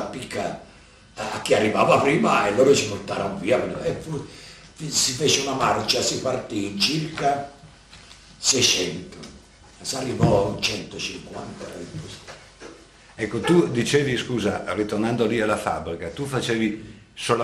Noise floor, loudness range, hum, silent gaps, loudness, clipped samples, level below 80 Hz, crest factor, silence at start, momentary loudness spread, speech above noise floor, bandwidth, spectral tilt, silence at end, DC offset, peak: -49 dBFS; 6 LU; none; none; -22 LUFS; under 0.1%; -50 dBFS; 22 dB; 0 s; 19 LU; 26 dB; 14 kHz; -3.5 dB/octave; 0 s; under 0.1%; -2 dBFS